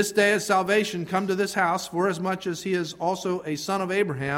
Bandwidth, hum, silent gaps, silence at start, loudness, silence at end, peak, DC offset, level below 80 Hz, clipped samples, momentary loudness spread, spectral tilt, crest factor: 16.5 kHz; none; none; 0 s; -25 LUFS; 0 s; -8 dBFS; under 0.1%; -64 dBFS; under 0.1%; 7 LU; -4.5 dB/octave; 16 dB